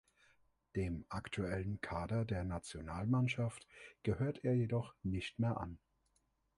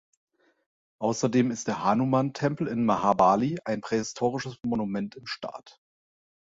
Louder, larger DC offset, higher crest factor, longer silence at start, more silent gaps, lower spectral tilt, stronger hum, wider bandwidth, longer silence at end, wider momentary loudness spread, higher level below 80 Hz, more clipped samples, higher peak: second, -40 LUFS vs -27 LUFS; neither; about the same, 18 dB vs 20 dB; second, 0.75 s vs 1 s; neither; about the same, -7 dB/octave vs -6 dB/octave; neither; first, 11.5 kHz vs 8 kHz; about the same, 0.8 s vs 0.8 s; second, 10 LU vs 13 LU; first, -56 dBFS vs -62 dBFS; neither; second, -22 dBFS vs -8 dBFS